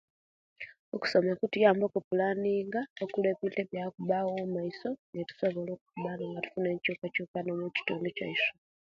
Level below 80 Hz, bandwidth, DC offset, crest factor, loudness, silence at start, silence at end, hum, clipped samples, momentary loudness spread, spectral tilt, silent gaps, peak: -74 dBFS; 7.6 kHz; under 0.1%; 22 dB; -32 LUFS; 0.6 s; 0.3 s; none; under 0.1%; 11 LU; -7 dB/octave; 0.79-0.92 s, 2.04-2.11 s, 2.90-2.96 s, 4.99-5.13 s, 5.81-5.86 s, 7.28-7.34 s; -10 dBFS